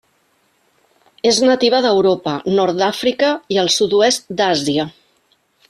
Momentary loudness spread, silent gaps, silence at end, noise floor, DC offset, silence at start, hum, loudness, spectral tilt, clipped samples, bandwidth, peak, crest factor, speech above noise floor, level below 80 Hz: 7 LU; none; 0.8 s; -61 dBFS; under 0.1%; 1.25 s; none; -15 LUFS; -3.5 dB/octave; under 0.1%; 13 kHz; -2 dBFS; 16 dB; 45 dB; -58 dBFS